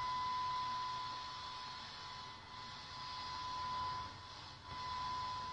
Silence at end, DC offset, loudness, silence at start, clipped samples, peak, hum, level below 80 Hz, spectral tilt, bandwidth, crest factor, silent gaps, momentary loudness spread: 0 s; under 0.1%; -44 LUFS; 0 s; under 0.1%; -32 dBFS; none; -66 dBFS; -2.5 dB/octave; 10.5 kHz; 12 dB; none; 10 LU